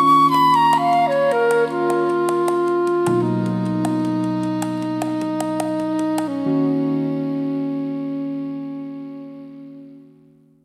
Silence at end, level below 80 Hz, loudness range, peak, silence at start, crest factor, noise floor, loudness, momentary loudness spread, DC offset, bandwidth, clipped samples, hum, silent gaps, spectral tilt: 0.65 s; -64 dBFS; 8 LU; -6 dBFS; 0 s; 14 dB; -52 dBFS; -20 LUFS; 15 LU; under 0.1%; 15 kHz; under 0.1%; none; none; -6.5 dB/octave